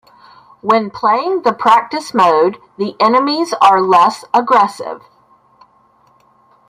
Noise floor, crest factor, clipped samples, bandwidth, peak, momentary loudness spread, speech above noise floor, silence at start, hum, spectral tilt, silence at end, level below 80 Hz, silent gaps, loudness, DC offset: -52 dBFS; 14 dB; under 0.1%; 15.5 kHz; 0 dBFS; 12 LU; 39 dB; 0.65 s; none; -4.5 dB/octave; 1.7 s; -62 dBFS; none; -13 LUFS; under 0.1%